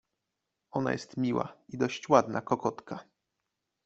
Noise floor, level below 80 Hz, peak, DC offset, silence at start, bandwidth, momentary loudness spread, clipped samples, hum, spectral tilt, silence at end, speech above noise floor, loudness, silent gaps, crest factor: -85 dBFS; -68 dBFS; -6 dBFS; under 0.1%; 0.75 s; 8 kHz; 16 LU; under 0.1%; none; -6 dB/octave; 0.85 s; 55 dB; -30 LUFS; none; 26 dB